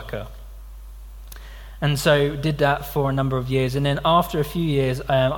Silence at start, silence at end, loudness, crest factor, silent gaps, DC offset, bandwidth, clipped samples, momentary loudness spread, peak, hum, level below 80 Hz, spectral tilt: 0 s; 0 s; -21 LUFS; 18 dB; none; under 0.1%; 17.5 kHz; under 0.1%; 24 LU; -4 dBFS; none; -38 dBFS; -6 dB/octave